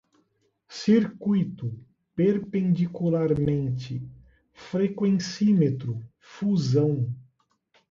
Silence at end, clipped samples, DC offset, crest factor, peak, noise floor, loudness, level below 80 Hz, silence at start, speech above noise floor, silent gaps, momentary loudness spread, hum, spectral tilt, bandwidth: 0.7 s; under 0.1%; under 0.1%; 16 dB; -10 dBFS; -70 dBFS; -25 LUFS; -58 dBFS; 0.7 s; 46 dB; none; 15 LU; none; -8 dB/octave; 7.6 kHz